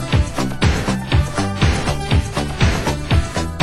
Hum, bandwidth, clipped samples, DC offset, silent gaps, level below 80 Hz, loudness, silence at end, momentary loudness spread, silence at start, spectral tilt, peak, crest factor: none; 16 kHz; under 0.1%; under 0.1%; none; -22 dBFS; -19 LUFS; 0 s; 4 LU; 0 s; -5.5 dB/octave; -2 dBFS; 16 dB